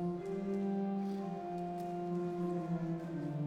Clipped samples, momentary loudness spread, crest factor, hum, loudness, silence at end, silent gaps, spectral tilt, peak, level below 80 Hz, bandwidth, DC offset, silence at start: under 0.1%; 4 LU; 10 dB; none; -39 LUFS; 0 s; none; -9 dB/octave; -28 dBFS; -70 dBFS; 9.2 kHz; under 0.1%; 0 s